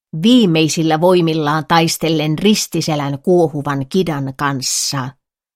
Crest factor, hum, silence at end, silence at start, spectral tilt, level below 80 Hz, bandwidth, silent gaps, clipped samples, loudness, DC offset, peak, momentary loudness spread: 14 dB; none; 0.45 s; 0.15 s; -4.5 dB/octave; -52 dBFS; 16.5 kHz; none; under 0.1%; -15 LUFS; under 0.1%; 0 dBFS; 7 LU